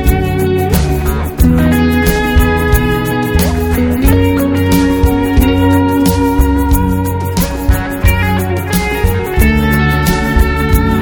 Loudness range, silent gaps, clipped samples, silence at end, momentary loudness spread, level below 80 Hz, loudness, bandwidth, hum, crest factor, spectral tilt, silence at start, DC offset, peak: 2 LU; none; 0.2%; 0 s; 4 LU; -16 dBFS; -12 LUFS; over 20 kHz; none; 10 dB; -6 dB/octave; 0 s; under 0.1%; 0 dBFS